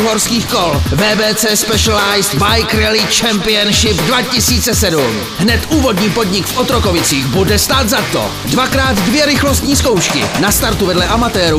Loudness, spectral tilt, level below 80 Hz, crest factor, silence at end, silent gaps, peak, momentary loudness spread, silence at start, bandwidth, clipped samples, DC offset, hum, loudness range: -11 LUFS; -3.5 dB/octave; -26 dBFS; 12 dB; 0 s; none; 0 dBFS; 3 LU; 0 s; 15.5 kHz; under 0.1%; 0.3%; none; 2 LU